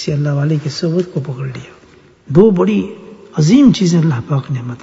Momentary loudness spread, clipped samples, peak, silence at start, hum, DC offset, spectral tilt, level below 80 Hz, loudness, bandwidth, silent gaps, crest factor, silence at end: 16 LU; 0.1%; 0 dBFS; 0 s; none; under 0.1%; -7 dB/octave; -48 dBFS; -14 LUFS; 7.8 kHz; none; 14 dB; 0.05 s